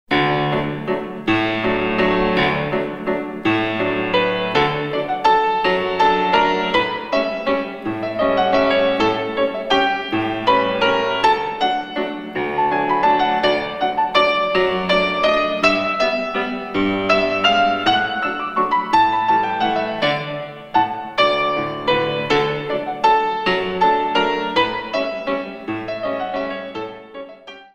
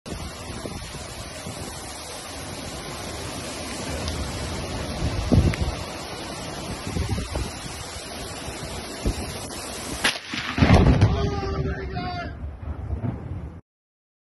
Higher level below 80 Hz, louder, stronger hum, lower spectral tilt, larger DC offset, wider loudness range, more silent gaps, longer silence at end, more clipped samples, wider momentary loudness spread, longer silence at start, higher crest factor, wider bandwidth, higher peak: second, -46 dBFS vs -34 dBFS; first, -18 LUFS vs -27 LUFS; neither; about the same, -5.5 dB/octave vs -5 dB/octave; neither; second, 2 LU vs 9 LU; neither; second, 0.1 s vs 0.65 s; neither; second, 8 LU vs 13 LU; about the same, 0.1 s vs 0.05 s; about the same, 18 dB vs 22 dB; second, 10.5 kHz vs 12 kHz; about the same, -2 dBFS vs -4 dBFS